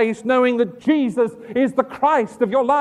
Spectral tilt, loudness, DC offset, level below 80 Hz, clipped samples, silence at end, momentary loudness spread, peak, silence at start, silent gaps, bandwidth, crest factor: -6 dB/octave; -19 LUFS; under 0.1%; -62 dBFS; under 0.1%; 0 s; 4 LU; -2 dBFS; 0 s; none; 11 kHz; 16 dB